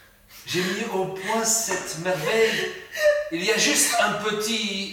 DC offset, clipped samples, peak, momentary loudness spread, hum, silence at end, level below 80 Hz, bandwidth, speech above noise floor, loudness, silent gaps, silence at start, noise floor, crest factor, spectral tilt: under 0.1%; under 0.1%; -8 dBFS; 9 LU; none; 0 s; -62 dBFS; 18 kHz; 21 dB; -23 LUFS; none; 0.3 s; -45 dBFS; 16 dB; -2 dB/octave